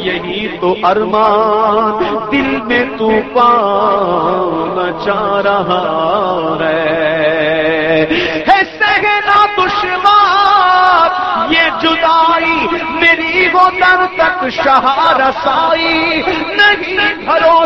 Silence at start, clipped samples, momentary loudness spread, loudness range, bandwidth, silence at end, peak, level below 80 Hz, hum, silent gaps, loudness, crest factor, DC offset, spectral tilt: 0 s; under 0.1%; 6 LU; 3 LU; 7.8 kHz; 0 s; 0 dBFS; -42 dBFS; none; none; -11 LUFS; 12 dB; 0.2%; -5 dB/octave